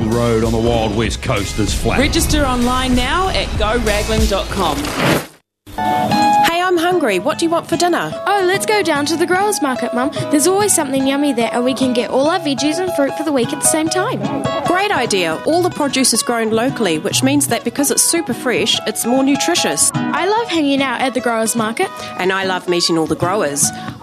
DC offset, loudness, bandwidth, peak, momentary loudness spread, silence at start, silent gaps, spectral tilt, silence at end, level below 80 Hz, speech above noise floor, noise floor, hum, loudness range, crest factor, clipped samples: under 0.1%; -15 LUFS; 14 kHz; 0 dBFS; 5 LU; 0 s; none; -3.5 dB/octave; 0 s; -30 dBFS; 23 dB; -39 dBFS; none; 2 LU; 16 dB; under 0.1%